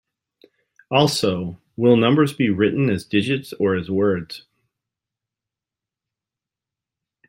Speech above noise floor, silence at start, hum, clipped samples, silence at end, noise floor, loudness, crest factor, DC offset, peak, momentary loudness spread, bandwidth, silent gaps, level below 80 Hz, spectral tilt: 69 dB; 0.9 s; none; under 0.1%; 2.9 s; -88 dBFS; -19 LUFS; 20 dB; under 0.1%; -2 dBFS; 11 LU; 16 kHz; none; -60 dBFS; -6 dB/octave